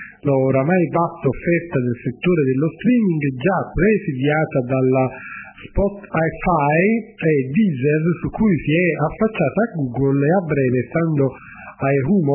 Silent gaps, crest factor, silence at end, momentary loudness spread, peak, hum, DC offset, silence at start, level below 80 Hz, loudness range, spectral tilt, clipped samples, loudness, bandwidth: none; 14 dB; 0 s; 5 LU; -4 dBFS; none; under 0.1%; 0 s; -40 dBFS; 1 LU; -12.5 dB/octave; under 0.1%; -19 LUFS; 3.2 kHz